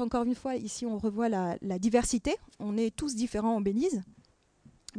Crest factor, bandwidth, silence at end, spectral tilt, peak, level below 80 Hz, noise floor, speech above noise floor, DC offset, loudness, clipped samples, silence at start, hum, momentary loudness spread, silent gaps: 20 dB; 10.5 kHz; 0 s; -5 dB/octave; -12 dBFS; -52 dBFS; -63 dBFS; 32 dB; under 0.1%; -31 LUFS; under 0.1%; 0 s; none; 7 LU; none